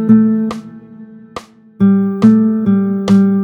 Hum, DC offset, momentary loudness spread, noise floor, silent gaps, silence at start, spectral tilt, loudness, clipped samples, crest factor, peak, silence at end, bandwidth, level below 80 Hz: none; under 0.1%; 21 LU; -36 dBFS; none; 0 s; -9 dB/octave; -12 LUFS; under 0.1%; 12 dB; 0 dBFS; 0 s; 7.6 kHz; -52 dBFS